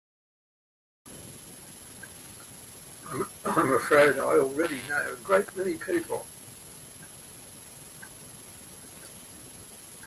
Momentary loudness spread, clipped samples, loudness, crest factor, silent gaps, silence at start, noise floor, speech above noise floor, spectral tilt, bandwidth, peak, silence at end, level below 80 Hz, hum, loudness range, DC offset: 21 LU; under 0.1%; -26 LUFS; 20 dB; none; 1.05 s; -47 dBFS; 21 dB; -4 dB/octave; 15.5 kHz; -10 dBFS; 0 s; -64 dBFS; none; 19 LU; under 0.1%